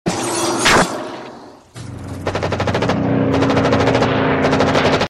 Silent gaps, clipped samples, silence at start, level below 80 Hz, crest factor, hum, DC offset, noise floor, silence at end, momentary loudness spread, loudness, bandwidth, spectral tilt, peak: none; under 0.1%; 0.05 s; -40 dBFS; 14 dB; none; under 0.1%; -37 dBFS; 0 s; 18 LU; -16 LUFS; 14.5 kHz; -4.5 dB/octave; -2 dBFS